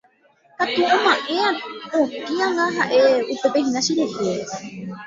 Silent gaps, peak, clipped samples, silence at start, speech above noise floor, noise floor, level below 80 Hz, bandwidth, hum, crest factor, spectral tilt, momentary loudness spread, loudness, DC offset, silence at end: none; -4 dBFS; under 0.1%; 0.6 s; 37 dB; -57 dBFS; -66 dBFS; 7.8 kHz; none; 18 dB; -3.5 dB/octave; 11 LU; -20 LUFS; under 0.1%; 0 s